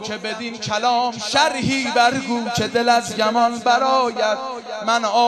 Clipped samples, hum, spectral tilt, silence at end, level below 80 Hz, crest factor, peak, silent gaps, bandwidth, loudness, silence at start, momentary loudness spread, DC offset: under 0.1%; none; -3 dB/octave; 0 s; -58 dBFS; 16 dB; -2 dBFS; none; 13 kHz; -19 LUFS; 0 s; 9 LU; under 0.1%